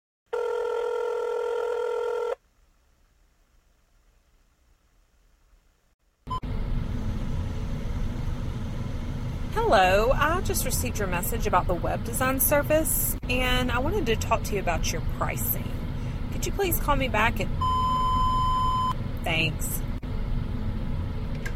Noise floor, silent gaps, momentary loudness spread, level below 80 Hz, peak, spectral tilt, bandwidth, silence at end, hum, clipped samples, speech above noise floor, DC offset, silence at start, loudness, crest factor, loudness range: -63 dBFS; 5.94-5.99 s; 11 LU; -32 dBFS; -8 dBFS; -4.5 dB/octave; 16.5 kHz; 0 s; none; under 0.1%; 39 dB; under 0.1%; 0.3 s; -27 LUFS; 18 dB; 11 LU